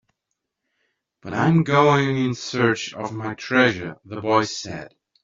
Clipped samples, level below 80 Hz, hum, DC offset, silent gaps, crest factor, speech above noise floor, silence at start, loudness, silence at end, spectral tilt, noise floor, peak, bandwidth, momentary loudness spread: under 0.1%; -60 dBFS; none; under 0.1%; none; 20 dB; 59 dB; 1.25 s; -21 LUFS; 0.35 s; -5.5 dB/octave; -80 dBFS; -2 dBFS; 7.6 kHz; 15 LU